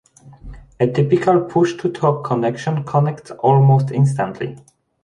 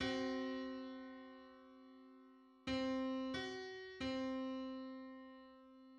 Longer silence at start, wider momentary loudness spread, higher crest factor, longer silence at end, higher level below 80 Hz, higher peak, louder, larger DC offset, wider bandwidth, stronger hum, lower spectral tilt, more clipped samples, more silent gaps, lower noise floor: first, 0.25 s vs 0 s; second, 9 LU vs 21 LU; about the same, 16 dB vs 16 dB; first, 0.45 s vs 0 s; first, -48 dBFS vs -70 dBFS; first, -2 dBFS vs -30 dBFS; first, -17 LUFS vs -45 LUFS; neither; about the same, 9.8 kHz vs 9.4 kHz; neither; first, -8.5 dB/octave vs -5 dB/octave; neither; neither; second, -38 dBFS vs -65 dBFS